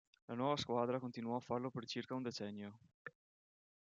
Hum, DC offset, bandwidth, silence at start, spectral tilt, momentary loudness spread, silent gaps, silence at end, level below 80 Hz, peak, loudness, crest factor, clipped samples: none; under 0.1%; 7.8 kHz; 0.3 s; -5.5 dB/octave; 18 LU; 2.94-3.05 s; 0.75 s; -82 dBFS; -24 dBFS; -42 LUFS; 20 dB; under 0.1%